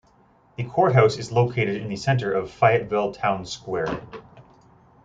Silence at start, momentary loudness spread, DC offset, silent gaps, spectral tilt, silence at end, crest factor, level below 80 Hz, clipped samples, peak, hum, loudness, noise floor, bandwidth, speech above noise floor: 0.6 s; 15 LU; under 0.1%; none; -6.5 dB/octave; 0.65 s; 20 dB; -56 dBFS; under 0.1%; -4 dBFS; none; -22 LUFS; -58 dBFS; 7.8 kHz; 35 dB